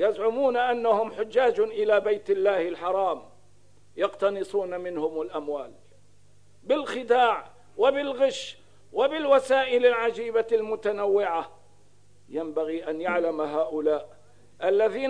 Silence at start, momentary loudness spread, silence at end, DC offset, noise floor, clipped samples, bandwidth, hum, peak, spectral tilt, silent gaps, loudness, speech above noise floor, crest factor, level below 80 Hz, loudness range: 0 s; 11 LU; 0 s; 0.3%; -61 dBFS; under 0.1%; 10.5 kHz; 50 Hz at -65 dBFS; -8 dBFS; -4.5 dB/octave; none; -26 LUFS; 36 dB; 18 dB; -68 dBFS; 6 LU